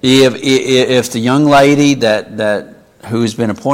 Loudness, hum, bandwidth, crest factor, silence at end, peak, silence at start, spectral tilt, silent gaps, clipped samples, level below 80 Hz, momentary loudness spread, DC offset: -12 LUFS; none; 16.5 kHz; 12 dB; 0 s; 0 dBFS; 0.05 s; -5 dB/octave; none; under 0.1%; -48 dBFS; 9 LU; under 0.1%